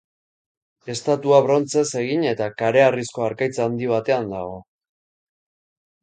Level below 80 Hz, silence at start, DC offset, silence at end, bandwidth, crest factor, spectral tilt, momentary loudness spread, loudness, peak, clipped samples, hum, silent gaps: -62 dBFS; 0.85 s; under 0.1%; 1.4 s; 9.4 kHz; 20 dB; -5 dB/octave; 14 LU; -20 LUFS; -2 dBFS; under 0.1%; none; none